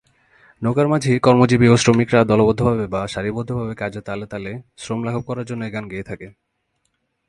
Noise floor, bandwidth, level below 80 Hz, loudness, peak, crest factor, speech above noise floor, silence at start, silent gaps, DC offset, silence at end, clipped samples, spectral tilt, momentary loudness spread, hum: -71 dBFS; 11.5 kHz; -46 dBFS; -18 LUFS; 0 dBFS; 18 dB; 52 dB; 0.6 s; none; under 0.1%; 1 s; under 0.1%; -6.5 dB/octave; 17 LU; none